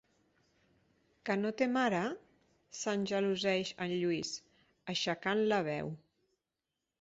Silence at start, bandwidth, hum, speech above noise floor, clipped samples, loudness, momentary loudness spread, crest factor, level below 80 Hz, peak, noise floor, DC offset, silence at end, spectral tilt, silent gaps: 1.25 s; 8 kHz; none; 55 dB; under 0.1%; -34 LUFS; 14 LU; 20 dB; -76 dBFS; -18 dBFS; -89 dBFS; under 0.1%; 1.05 s; -3.5 dB/octave; none